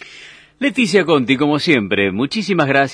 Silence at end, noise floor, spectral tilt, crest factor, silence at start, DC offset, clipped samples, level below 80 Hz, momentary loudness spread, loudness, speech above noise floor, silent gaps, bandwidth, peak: 0 s; -41 dBFS; -5.5 dB/octave; 16 dB; 0.05 s; under 0.1%; under 0.1%; -58 dBFS; 6 LU; -15 LUFS; 25 dB; none; 10.5 kHz; 0 dBFS